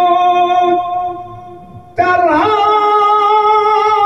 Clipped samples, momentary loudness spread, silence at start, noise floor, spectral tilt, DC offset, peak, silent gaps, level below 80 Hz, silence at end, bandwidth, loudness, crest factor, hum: under 0.1%; 12 LU; 0 s; -34 dBFS; -5 dB/octave; 0.3%; 0 dBFS; none; -52 dBFS; 0 s; 10 kHz; -11 LUFS; 12 dB; none